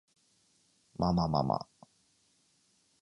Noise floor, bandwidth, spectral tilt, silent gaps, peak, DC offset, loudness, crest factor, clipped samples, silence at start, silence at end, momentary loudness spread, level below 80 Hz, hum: -71 dBFS; 10.5 kHz; -8.5 dB/octave; none; -16 dBFS; under 0.1%; -32 LUFS; 22 dB; under 0.1%; 1 s; 1.4 s; 21 LU; -54 dBFS; none